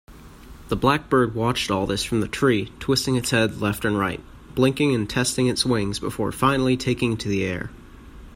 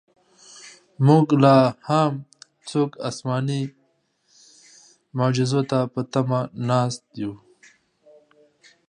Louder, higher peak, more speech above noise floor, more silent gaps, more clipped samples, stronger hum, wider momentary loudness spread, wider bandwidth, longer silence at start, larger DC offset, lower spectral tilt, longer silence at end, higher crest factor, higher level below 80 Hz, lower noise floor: about the same, -22 LUFS vs -21 LUFS; about the same, -4 dBFS vs -2 dBFS; second, 21 dB vs 47 dB; neither; neither; neither; second, 7 LU vs 18 LU; first, 16 kHz vs 10.5 kHz; second, 0.1 s vs 0.55 s; neither; second, -5 dB/octave vs -7 dB/octave; second, 0.05 s vs 1.55 s; about the same, 20 dB vs 22 dB; first, -44 dBFS vs -66 dBFS; second, -43 dBFS vs -67 dBFS